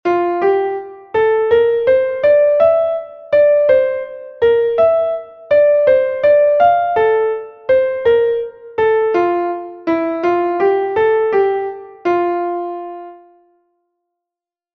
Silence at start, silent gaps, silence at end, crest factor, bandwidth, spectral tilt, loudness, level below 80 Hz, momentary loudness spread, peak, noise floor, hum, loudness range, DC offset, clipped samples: 0.05 s; none; 1.6 s; 14 dB; 5.8 kHz; -7 dB/octave; -15 LUFS; -54 dBFS; 12 LU; -2 dBFS; -87 dBFS; none; 4 LU; under 0.1%; under 0.1%